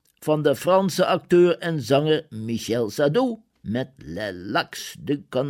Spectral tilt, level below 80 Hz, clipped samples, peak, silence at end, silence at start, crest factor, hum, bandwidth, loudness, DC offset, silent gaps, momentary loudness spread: -5.5 dB/octave; -60 dBFS; under 0.1%; -6 dBFS; 0 s; 0.2 s; 16 dB; none; 16.5 kHz; -23 LUFS; under 0.1%; none; 12 LU